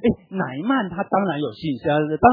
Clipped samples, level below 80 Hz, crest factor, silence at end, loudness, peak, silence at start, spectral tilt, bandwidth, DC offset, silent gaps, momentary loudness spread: under 0.1%; -48 dBFS; 20 dB; 0 s; -22 LUFS; 0 dBFS; 0 s; -10 dB/octave; 5 kHz; under 0.1%; none; 5 LU